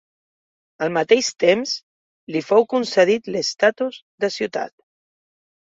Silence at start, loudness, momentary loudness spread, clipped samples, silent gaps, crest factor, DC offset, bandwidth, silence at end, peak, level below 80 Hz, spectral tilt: 0.8 s; -20 LUFS; 10 LU; under 0.1%; 1.83-2.27 s, 4.02-4.18 s; 20 dB; under 0.1%; 7.8 kHz; 1.1 s; -2 dBFS; -68 dBFS; -3.5 dB/octave